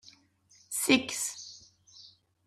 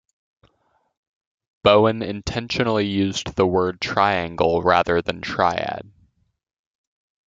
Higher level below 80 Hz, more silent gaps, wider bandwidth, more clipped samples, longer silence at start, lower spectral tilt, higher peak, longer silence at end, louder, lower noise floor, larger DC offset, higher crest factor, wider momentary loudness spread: second, -76 dBFS vs -50 dBFS; neither; first, 15 kHz vs 7.8 kHz; neither; second, 0.05 s vs 1.65 s; second, -1.5 dB/octave vs -5.5 dB/octave; second, -10 dBFS vs -2 dBFS; second, 0.4 s vs 1.45 s; second, -29 LUFS vs -20 LUFS; about the same, -64 dBFS vs -67 dBFS; neither; about the same, 24 dB vs 20 dB; first, 21 LU vs 10 LU